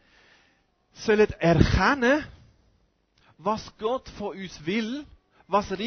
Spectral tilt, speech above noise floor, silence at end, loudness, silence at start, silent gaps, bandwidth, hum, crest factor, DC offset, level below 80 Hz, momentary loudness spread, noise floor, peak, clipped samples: -6 dB/octave; 42 dB; 0 s; -25 LUFS; 1 s; none; 6.6 kHz; none; 24 dB; under 0.1%; -40 dBFS; 14 LU; -66 dBFS; -2 dBFS; under 0.1%